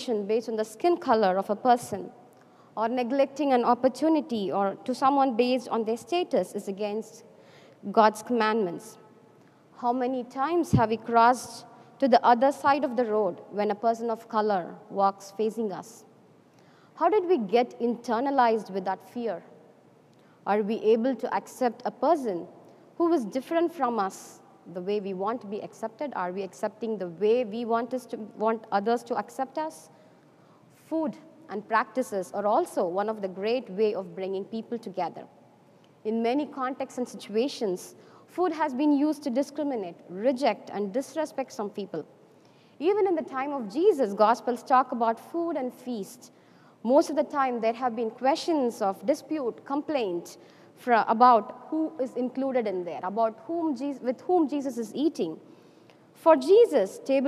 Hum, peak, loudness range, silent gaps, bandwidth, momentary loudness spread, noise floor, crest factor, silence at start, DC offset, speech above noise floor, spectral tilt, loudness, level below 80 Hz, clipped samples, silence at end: none; -6 dBFS; 6 LU; none; 14.5 kHz; 12 LU; -57 dBFS; 22 dB; 0 s; under 0.1%; 31 dB; -5.5 dB/octave; -27 LUFS; -68 dBFS; under 0.1%; 0 s